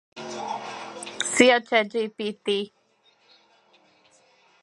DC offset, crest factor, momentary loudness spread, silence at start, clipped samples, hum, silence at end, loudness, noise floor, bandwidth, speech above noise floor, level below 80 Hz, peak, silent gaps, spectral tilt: under 0.1%; 26 dB; 19 LU; 0.15 s; under 0.1%; none; 1.95 s; -24 LUFS; -63 dBFS; 11.5 kHz; 41 dB; -70 dBFS; -2 dBFS; none; -2.5 dB/octave